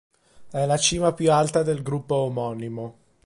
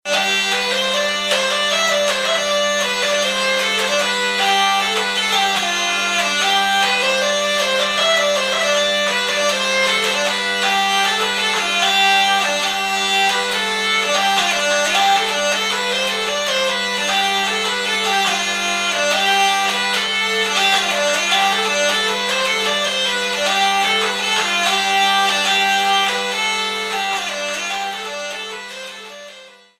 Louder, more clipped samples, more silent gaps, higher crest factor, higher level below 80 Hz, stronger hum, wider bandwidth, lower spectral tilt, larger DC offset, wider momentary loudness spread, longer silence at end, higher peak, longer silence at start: second, -23 LUFS vs -16 LUFS; neither; neither; about the same, 20 dB vs 16 dB; first, -52 dBFS vs -58 dBFS; neither; second, 11.5 kHz vs 16 kHz; first, -4.5 dB/octave vs -0.5 dB/octave; neither; first, 14 LU vs 4 LU; about the same, 0.35 s vs 0.3 s; about the same, -4 dBFS vs -2 dBFS; first, 0.4 s vs 0.05 s